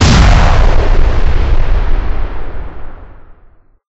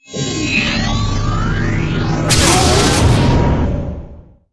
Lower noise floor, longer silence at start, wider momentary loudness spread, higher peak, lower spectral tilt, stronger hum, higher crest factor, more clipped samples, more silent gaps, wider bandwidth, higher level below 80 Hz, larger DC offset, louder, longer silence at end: first, -43 dBFS vs -36 dBFS; about the same, 0 s vs 0.1 s; first, 21 LU vs 9 LU; about the same, 0 dBFS vs 0 dBFS; about the same, -5.5 dB/octave vs -4.5 dB/octave; neither; second, 8 dB vs 14 dB; neither; neither; second, 8 kHz vs 11 kHz; first, -10 dBFS vs -22 dBFS; neither; about the same, -13 LUFS vs -14 LUFS; first, 0.7 s vs 0.3 s